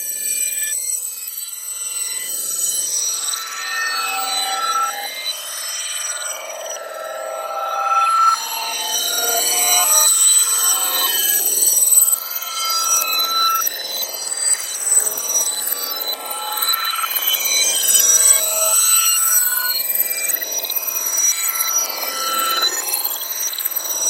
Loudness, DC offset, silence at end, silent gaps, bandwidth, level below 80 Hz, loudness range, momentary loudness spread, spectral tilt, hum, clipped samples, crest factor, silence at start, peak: -16 LUFS; under 0.1%; 0 s; none; 16.5 kHz; -86 dBFS; 8 LU; 12 LU; 3.5 dB/octave; none; under 0.1%; 18 dB; 0 s; 0 dBFS